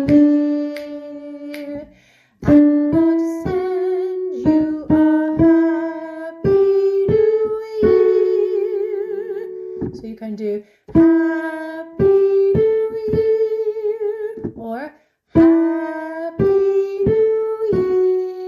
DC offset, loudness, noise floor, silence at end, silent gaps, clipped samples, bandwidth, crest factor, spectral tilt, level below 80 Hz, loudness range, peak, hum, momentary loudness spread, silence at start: under 0.1%; -17 LUFS; -53 dBFS; 0 s; none; under 0.1%; 6.8 kHz; 14 dB; -9.5 dB/octave; -44 dBFS; 3 LU; -2 dBFS; none; 16 LU; 0 s